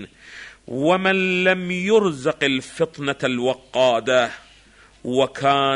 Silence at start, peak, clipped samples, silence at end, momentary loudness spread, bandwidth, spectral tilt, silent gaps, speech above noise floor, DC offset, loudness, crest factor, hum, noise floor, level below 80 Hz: 0 s; -4 dBFS; under 0.1%; 0 s; 17 LU; 11 kHz; -5 dB/octave; none; 30 dB; under 0.1%; -20 LUFS; 16 dB; none; -51 dBFS; -58 dBFS